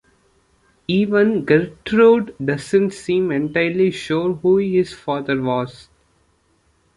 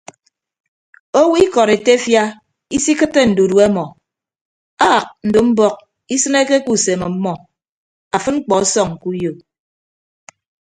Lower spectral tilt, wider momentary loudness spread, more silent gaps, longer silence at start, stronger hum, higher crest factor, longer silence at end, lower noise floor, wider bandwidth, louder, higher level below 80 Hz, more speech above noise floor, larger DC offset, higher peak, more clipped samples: first, -7 dB/octave vs -4 dB/octave; about the same, 9 LU vs 10 LU; second, none vs 4.41-4.77 s, 7.69-8.11 s; second, 0.9 s vs 1.15 s; neither; about the same, 16 dB vs 16 dB; about the same, 1.25 s vs 1.25 s; second, -61 dBFS vs under -90 dBFS; about the same, 11.5 kHz vs 11 kHz; second, -18 LUFS vs -15 LUFS; about the same, -54 dBFS vs -50 dBFS; second, 44 dB vs over 76 dB; neither; about the same, -2 dBFS vs 0 dBFS; neither